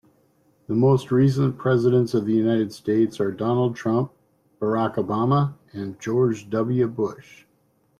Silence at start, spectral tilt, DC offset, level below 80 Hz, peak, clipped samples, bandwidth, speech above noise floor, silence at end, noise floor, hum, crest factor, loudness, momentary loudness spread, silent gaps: 0.7 s; -8.5 dB/octave; under 0.1%; -60 dBFS; -8 dBFS; under 0.1%; 12 kHz; 43 dB; 0.8 s; -64 dBFS; none; 14 dB; -22 LUFS; 9 LU; none